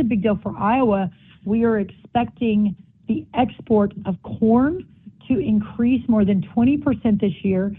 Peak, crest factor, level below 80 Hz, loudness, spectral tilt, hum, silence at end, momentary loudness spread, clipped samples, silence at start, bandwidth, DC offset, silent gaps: -6 dBFS; 14 dB; -46 dBFS; -20 LUFS; -11.5 dB/octave; none; 0 s; 8 LU; under 0.1%; 0 s; 3.8 kHz; under 0.1%; none